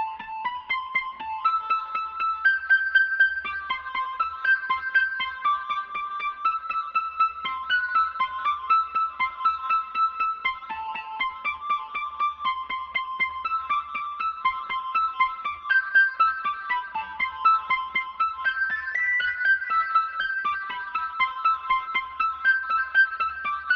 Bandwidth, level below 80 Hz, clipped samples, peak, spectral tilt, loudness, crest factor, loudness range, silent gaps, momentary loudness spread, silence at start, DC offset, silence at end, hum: 6.6 kHz; -60 dBFS; under 0.1%; -10 dBFS; 3.5 dB/octave; -25 LUFS; 16 dB; 4 LU; none; 9 LU; 0 s; under 0.1%; 0 s; none